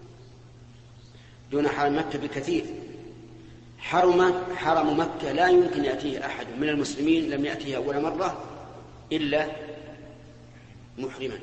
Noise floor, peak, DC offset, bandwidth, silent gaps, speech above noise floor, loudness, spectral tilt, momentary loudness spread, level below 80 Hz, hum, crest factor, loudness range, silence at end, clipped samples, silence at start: -49 dBFS; -8 dBFS; under 0.1%; 8.6 kHz; none; 24 dB; -26 LUFS; -5.5 dB/octave; 23 LU; -54 dBFS; none; 18 dB; 7 LU; 0 s; under 0.1%; 0 s